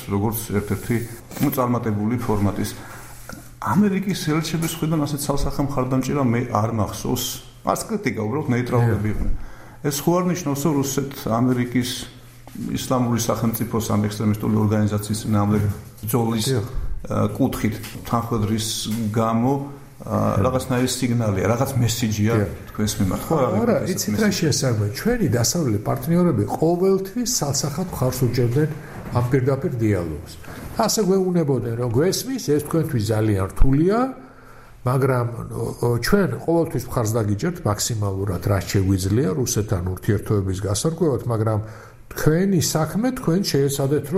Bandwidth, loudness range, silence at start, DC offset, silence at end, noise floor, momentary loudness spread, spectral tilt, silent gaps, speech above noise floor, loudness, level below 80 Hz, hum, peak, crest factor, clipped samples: 16 kHz; 3 LU; 0 s; under 0.1%; 0 s; -43 dBFS; 8 LU; -5.5 dB/octave; none; 23 dB; -22 LUFS; -36 dBFS; none; -4 dBFS; 16 dB; under 0.1%